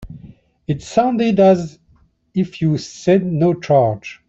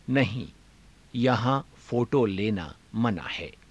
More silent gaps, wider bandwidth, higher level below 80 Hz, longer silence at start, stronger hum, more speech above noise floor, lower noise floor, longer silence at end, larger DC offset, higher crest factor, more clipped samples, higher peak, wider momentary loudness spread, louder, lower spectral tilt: neither; second, 8 kHz vs 11 kHz; first, -48 dBFS vs -54 dBFS; about the same, 0 s vs 0.1 s; neither; first, 39 dB vs 29 dB; about the same, -55 dBFS vs -55 dBFS; about the same, 0.15 s vs 0.2 s; neither; about the same, 14 dB vs 18 dB; neither; first, -2 dBFS vs -10 dBFS; about the same, 12 LU vs 11 LU; first, -17 LUFS vs -28 LUFS; about the same, -7.5 dB/octave vs -7.5 dB/octave